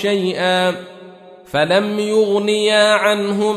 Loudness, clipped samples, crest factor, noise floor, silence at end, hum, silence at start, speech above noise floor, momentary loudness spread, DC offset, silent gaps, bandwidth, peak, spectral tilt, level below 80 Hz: -16 LUFS; under 0.1%; 14 dB; -39 dBFS; 0 s; none; 0 s; 24 dB; 7 LU; under 0.1%; none; 14 kHz; -2 dBFS; -4 dB/octave; -60 dBFS